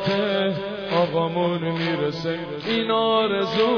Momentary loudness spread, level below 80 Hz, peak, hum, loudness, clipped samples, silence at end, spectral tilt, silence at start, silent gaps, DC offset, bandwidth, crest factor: 7 LU; -60 dBFS; -8 dBFS; none; -23 LUFS; under 0.1%; 0 s; -7 dB/octave; 0 s; none; under 0.1%; 5.4 kHz; 14 dB